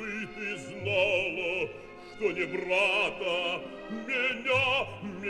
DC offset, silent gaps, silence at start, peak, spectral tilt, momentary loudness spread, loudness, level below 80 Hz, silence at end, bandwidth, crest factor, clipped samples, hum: under 0.1%; none; 0 s; -14 dBFS; -4 dB/octave; 12 LU; -29 LUFS; -60 dBFS; 0 s; 12 kHz; 18 dB; under 0.1%; none